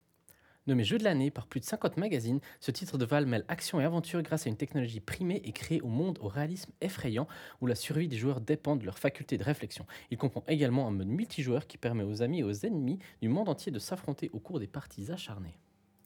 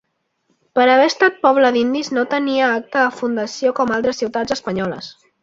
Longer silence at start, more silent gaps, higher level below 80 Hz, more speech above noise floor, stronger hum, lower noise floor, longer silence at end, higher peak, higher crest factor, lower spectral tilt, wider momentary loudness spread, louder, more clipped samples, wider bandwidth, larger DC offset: about the same, 0.65 s vs 0.75 s; neither; second, -66 dBFS vs -58 dBFS; second, 31 dB vs 50 dB; neither; about the same, -64 dBFS vs -67 dBFS; first, 0.5 s vs 0.3 s; second, -14 dBFS vs -2 dBFS; about the same, 20 dB vs 16 dB; first, -6 dB/octave vs -4.5 dB/octave; about the same, 9 LU vs 10 LU; second, -34 LUFS vs -17 LUFS; neither; first, 20 kHz vs 7.8 kHz; neither